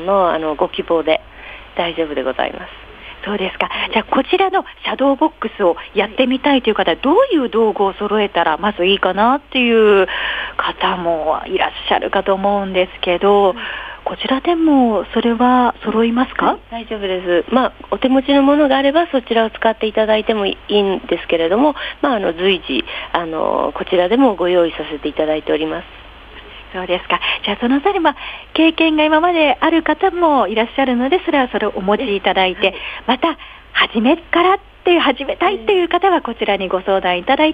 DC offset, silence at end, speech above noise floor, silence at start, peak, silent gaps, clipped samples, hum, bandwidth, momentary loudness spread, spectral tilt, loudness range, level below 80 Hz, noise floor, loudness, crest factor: under 0.1%; 0 s; 21 dB; 0 s; 0 dBFS; none; under 0.1%; none; 8 kHz; 8 LU; -7 dB/octave; 4 LU; -44 dBFS; -37 dBFS; -16 LUFS; 16 dB